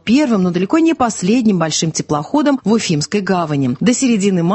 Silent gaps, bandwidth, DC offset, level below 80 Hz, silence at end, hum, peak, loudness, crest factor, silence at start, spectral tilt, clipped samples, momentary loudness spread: none; 8.6 kHz; under 0.1%; -52 dBFS; 0 s; none; 0 dBFS; -15 LUFS; 14 dB; 0.05 s; -5 dB/octave; under 0.1%; 4 LU